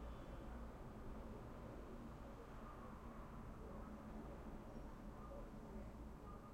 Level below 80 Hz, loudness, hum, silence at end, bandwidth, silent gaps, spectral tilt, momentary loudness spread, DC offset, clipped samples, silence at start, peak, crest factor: -58 dBFS; -56 LUFS; none; 0 s; 16 kHz; none; -7.5 dB/octave; 2 LU; under 0.1%; under 0.1%; 0 s; -40 dBFS; 14 dB